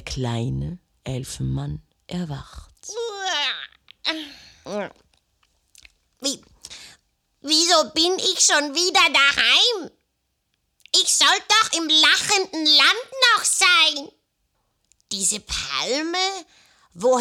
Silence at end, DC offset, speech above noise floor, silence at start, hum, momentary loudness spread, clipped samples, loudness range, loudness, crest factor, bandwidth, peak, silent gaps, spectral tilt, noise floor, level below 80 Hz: 0 s; under 0.1%; 53 dB; 0.05 s; none; 20 LU; under 0.1%; 13 LU; -18 LUFS; 18 dB; 19.5 kHz; -4 dBFS; none; -1.5 dB/octave; -73 dBFS; -48 dBFS